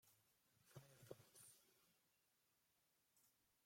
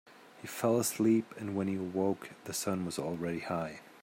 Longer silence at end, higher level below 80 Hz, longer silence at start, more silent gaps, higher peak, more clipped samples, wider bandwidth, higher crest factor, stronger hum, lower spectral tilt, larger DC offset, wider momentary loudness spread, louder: about the same, 0 s vs 0.05 s; second, under -90 dBFS vs -74 dBFS; about the same, 0 s vs 0.05 s; neither; second, -42 dBFS vs -18 dBFS; neither; about the same, 16.5 kHz vs 16 kHz; first, 30 dB vs 16 dB; neither; about the same, -4 dB/octave vs -5 dB/octave; neither; second, 4 LU vs 11 LU; second, -66 LUFS vs -34 LUFS